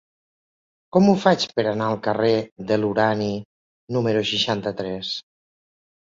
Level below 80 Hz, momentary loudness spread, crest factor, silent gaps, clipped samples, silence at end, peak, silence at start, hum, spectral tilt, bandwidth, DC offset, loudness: -58 dBFS; 10 LU; 20 dB; 2.52-2.56 s, 3.45-3.87 s; under 0.1%; 0.8 s; -2 dBFS; 0.95 s; none; -5.5 dB/octave; 7.6 kHz; under 0.1%; -22 LUFS